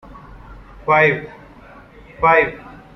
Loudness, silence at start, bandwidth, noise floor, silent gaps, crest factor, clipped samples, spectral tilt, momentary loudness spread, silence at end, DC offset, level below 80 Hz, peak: -16 LUFS; 0.1 s; 6.2 kHz; -42 dBFS; none; 18 dB; under 0.1%; -7 dB/octave; 20 LU; 0.2 s; under 0.1%; -44 dBFS; -2 dBFS